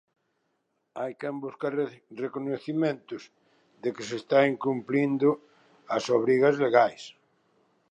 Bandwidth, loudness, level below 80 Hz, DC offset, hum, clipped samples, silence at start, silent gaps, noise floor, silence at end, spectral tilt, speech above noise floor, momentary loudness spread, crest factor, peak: 9.2 kHz; -27 LUFS; -82 dBFS; under 0.1%; none; under 0.1%; 0.95 s; none; -76 dBFS; 0.8 s; -6 dB/octave; 50 dB; 14 LU; 22 dB; -6 dBFS